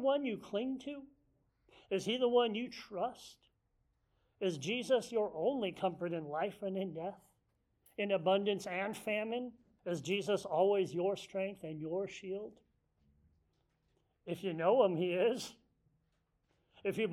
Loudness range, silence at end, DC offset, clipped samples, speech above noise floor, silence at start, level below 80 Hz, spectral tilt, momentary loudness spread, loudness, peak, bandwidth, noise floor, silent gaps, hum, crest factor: 3 LU; 0 s; under 0.1%; under 0.1%; 44 dB; 0 s; -78 dBFS; -5 dB/octave; 13 LU; -36 LUFS; -18 dBFS; 15 kHz; -79 dBFS; none; none; 20 dB